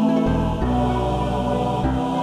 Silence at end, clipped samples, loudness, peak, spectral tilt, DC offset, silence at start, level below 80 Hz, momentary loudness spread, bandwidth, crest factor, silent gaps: 0 s; under 0.1%; -21 LUFS; -8 dBFS; -8 dB/octave; under 0.1%; 0 s; -30 dBFS; 2 LU; 12 kHz; 12 dB; none